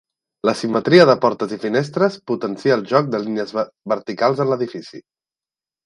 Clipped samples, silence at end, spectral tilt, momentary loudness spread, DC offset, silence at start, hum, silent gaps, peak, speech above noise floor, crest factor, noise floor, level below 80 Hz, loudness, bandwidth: under 0.1%; 0.85 s; -6.5 dB/octave; 12 LU; under 0.1%; 0.45 s; none; none; 0 dBFS; over 72 dB; 18 dB; under -90 dBFS; -66 dBFS; -18 LUFS; 11 kHz